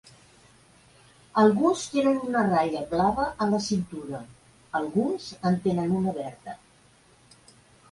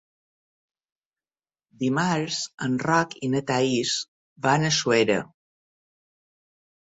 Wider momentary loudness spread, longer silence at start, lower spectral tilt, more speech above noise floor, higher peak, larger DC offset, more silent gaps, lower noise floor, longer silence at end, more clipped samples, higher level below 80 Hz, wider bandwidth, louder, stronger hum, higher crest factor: first, 16 LU vs 8 LU; second, 1.35 s vs 1.8 s; first, -6 dB/octave vs -4 dB/octave; second, 33 dB vs over 66 dB; about the same, -8 dBFS vs -6 dBFS; neither; second, none vs 2.54-2.58 s, 4.08-4.36 s; second, -58 dBFS vs under -90 dBFS; second, 1.35 s vs 1.6 s; neither; first, -56 dBFS vs -66 dBFS; first, 11.5 kHz vs 8.4 kHz; about the same, -26 LUFS vs -24 LUFS; neither; about the same, 20 dB vs 20 dB